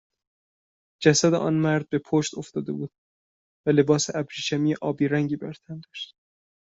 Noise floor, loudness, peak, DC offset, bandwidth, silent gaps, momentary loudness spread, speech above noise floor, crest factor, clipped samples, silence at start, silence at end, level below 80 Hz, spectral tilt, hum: under -90 dBFS; -24 LUFS; -4 dBFS; under 0.1%; 8 kHz; 2.98-3.64 s; 17 LU; over 66 dB; 22 dB; under 0.1%; 1 s; 0.75 s; -66 dBFS; -5 dB/octave; none